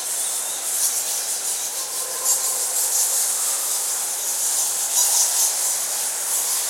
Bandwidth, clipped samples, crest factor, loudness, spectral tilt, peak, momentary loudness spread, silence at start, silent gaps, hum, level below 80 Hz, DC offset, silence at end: 16.5 kHz; under 0.1%; 18 dB; -19 LUFS; 3.5 dB/octave; -4 dBFS; 6 LU; 0 s; none; none; -80 dBFS; under 0.1%; 0 s